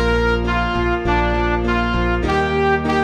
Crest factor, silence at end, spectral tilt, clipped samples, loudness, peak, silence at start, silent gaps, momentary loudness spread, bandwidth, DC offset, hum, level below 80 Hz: 14 dB; 0 s; -6.5 dB/octave; under 0.1%; -18 LUFS; -4 dBFS; 0 s; none; 2 LU; 8.8 kHz; under 0.1%; none; -24 dBFS